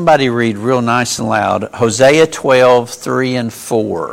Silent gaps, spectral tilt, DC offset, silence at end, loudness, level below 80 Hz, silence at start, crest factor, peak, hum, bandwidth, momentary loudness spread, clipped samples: none; -4.5 dB/octave; under 0.1%; 0 s; -13 LUFS; -50 dBFS; 0 s; 12 dB; 0 dBFS; none; 16.5 kHz; 8 LU; under 0.1%